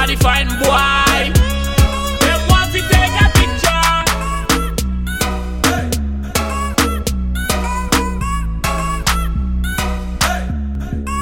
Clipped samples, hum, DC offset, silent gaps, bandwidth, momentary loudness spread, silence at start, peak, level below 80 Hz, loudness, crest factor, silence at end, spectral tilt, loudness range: under 0.1%; none; 0.4%; none; 17 kHz; 9 LU; 0 s; 0 dBFS; -20 dBFS; -16 LUFS; 16 dB; 0 s; -4 dB/octave; 5 LU